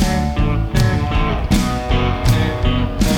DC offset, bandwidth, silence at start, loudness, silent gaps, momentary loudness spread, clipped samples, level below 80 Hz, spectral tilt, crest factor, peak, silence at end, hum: under 0.1%; 18 kHz; 0 s; -18 LUFS; none; 2 LU; under 0.1%; -20 dBFS; -6 dB/octave; 14 dB; -2 dBFS; 0 s; none